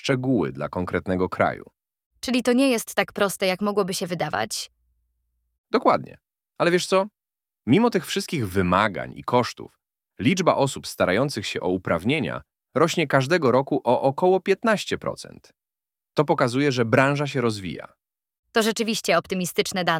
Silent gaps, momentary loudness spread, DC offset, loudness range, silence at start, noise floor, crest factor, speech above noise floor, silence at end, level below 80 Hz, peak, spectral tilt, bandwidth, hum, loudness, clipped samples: 2.06-2.11 s, 5.58-5.64 s, 18.39-18.43 s; 11 LU; under 0.1%; 3 LU; 0.05 s; under -90 dBFS; 20 dB; over 68 dB; 0 s; -58 dBFS; -2 dBFS; -5 dB/octave; 17 kHz; none; -23 LUFS; under 0.1%